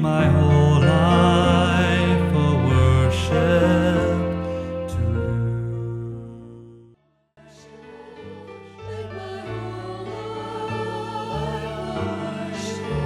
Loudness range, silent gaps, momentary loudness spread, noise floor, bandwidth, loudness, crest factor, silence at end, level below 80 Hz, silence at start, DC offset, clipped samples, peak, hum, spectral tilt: 19 LU; none; 19 LU; -58 dBFS; 11 kHz; -21 LUFS; 16 dB; 0 s; -36 dBFS; 0 s; under 0.1%; under 0.1%; -4 dBFS; none; -7 dB/octave